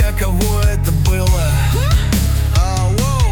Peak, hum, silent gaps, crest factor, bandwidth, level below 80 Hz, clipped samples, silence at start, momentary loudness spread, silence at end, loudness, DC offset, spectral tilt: -4 dBFS; none; none; 10 dB; 19.5 kHz; -16 dBFS; under 0.1%; 0 s; 1 LU; 0 s; -16 LUFS; under 0.1%; -5.5 dB/octave